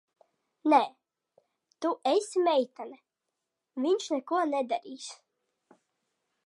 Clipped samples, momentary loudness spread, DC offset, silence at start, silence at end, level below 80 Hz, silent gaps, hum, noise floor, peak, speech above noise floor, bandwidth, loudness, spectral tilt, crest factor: under 0.1%; 18 LU; under 0.1%; 0.65 s; 1.35 s; under -90 dBFS; none; none; -86 dBFS; -10 dBFS; 57 dB; 11.5 kHz; -29 LUFS; -2.5 dB/octave; 22 dB